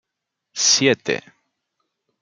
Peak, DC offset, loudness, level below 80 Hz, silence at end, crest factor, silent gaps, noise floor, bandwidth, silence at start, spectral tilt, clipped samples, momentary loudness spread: -2 dBFS; under 0.1%; -18 LUFS; -70 dBFS; 1.05 s; 22 dB; none; -81 dBFS; 11 kHz; 0.55 s; -1.5 dB/octave; under 0.1%; 14 LU